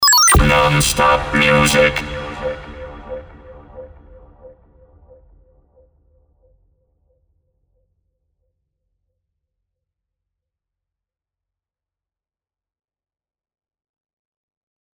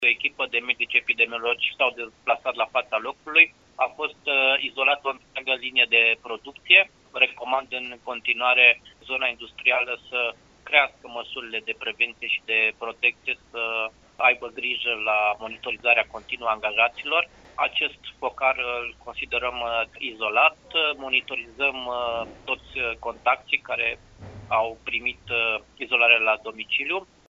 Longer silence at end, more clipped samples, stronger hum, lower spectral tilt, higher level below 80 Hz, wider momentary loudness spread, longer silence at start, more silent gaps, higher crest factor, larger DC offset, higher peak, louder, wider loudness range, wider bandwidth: first, 10.45 s vs 0.3 s; neither; neither; first, -3 dB/octave vs 2 dB/octave; first, -32 dBFS vs -58 dBFS; first, 23 LU vs 13 LU; about the same, 0 s vs 0 s; neither; about the same, 20 dB vs 24 dB; neither; about the same, 0 dBFS vs 0 dBFS; first, -13 LUFS vs -23 LUFS; first, 24 LU vs 5 LU; first, over 20 kHz vs 7.6 kHz